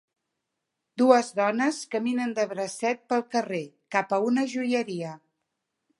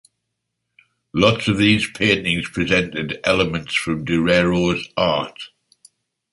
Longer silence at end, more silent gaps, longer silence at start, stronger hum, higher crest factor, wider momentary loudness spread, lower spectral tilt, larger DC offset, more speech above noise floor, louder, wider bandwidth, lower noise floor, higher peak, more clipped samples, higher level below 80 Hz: about the same, 0.85 s vs 0.85 s; neither; second, 0.95 s vs 1.15 s; neither; about the same, 22 dB vs 18 dB; first, 12 LU vs 8 LU; about the same, -4.5 dB/octave vs -5 dB/octave; neither; about the same, 57 dB vs 58 dB; second, -26 LUFS vs -19 LUFS; about the same, 11.5 kHz vs 11.5 kHz; first, -83 dBFS vs -77 dBFS; about the same, -4 dBFS vs -2 dBFS; neither; second, -82 dBFS vs -44 dBFS